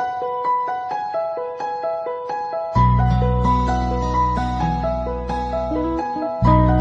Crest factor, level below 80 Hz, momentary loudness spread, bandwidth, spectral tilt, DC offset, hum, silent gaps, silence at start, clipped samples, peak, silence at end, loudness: 18 dB; -26 dBFS; 9 LU; 7.6 kHz; -8.5 dB/octave; under 0.1%; none; none; 0 s; under 0.1%; -2 dBFS; 0 s; -21 LUFS